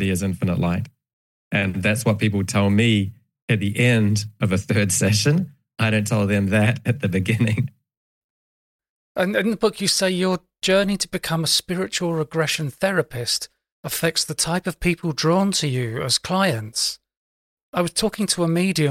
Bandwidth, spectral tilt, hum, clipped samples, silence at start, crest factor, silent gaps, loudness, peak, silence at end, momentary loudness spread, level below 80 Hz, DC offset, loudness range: 17 kHz; -4.5 dB/octave; none; under 0.1%; 0 s; 18 dB; 1.13-1.51 s, 3.42-3.48 s, 7.97-8.79 s, 8.89-9.15 s, 13.72-13.83 s, 17.17-17.57 s, 17.63-17.73 s; -21 LUFS; -4 dBFS; 0 s; 7 LU; -50 dBFS; under 0.1%; 3 LU